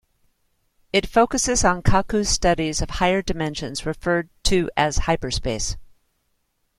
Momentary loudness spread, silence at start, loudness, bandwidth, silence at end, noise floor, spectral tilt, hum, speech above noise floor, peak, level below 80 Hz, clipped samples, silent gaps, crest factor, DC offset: 8 LU; 0.95 s; -22 LUFS; 13.5 kHz; 0.95 s; -70 dBFS; -4 dB/octave; none; 49 dB; -4 dBFS; -32 dBFS; under 0.1%; none; 18 dB; under 0.1%